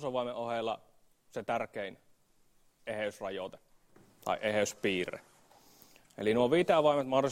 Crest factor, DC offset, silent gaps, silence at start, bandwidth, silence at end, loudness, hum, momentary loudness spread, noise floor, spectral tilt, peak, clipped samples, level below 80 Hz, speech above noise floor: 20 dB; under 0.1%; none; 0 s; 16 kHz; 0 s; -33 LUFS; none; 17 LU; -67 dBFS; -4.5 dB/octave; -14 dBFS; under 0.1%; -70 dBFS; 35 dB